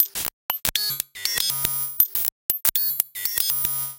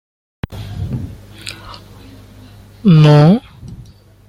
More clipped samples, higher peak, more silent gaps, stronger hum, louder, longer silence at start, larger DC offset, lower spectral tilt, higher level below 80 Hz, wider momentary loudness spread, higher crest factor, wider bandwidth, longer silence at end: neither; about the same, 0 dBFS vs -2 dBFS; first, 0.33-0.49 s, 2.32-2.49 s vs none; second, none vs 50 Hz at -35 dBFS; second, -21 LUFS vs -11 LUFS; second, 0 s vs 0.5 s; neither; second, 0.5 dB/octave vs -8 dB/octave; second, -52 dBFS vs -40 dBFS; second, 6 LU vs 28 LU; first, 24 dB vs 14 dB; first, 18 kHz vs 10 kHz; second, 0 s vs 0.5 s